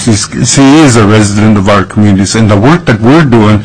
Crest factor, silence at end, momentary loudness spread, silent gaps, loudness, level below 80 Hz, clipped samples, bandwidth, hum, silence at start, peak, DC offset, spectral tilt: 4 dB; 0 s; 5 LU; none; -5 LUFS; -30 dBFS; 2%; 11 kHz; none; 0 s; 0 dBFS; 3%; -5.5 dB/octave